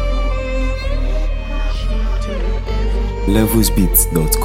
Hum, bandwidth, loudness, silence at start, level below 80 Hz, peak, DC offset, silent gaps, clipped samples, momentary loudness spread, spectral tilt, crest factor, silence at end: none; 17 kHz; -18 LUFS; 0 s; -18 dBFS; 0 dBFS; under 0.1%; none; under 0.1%; 9 LU; -5 dB/octave; 16 dB; 0 s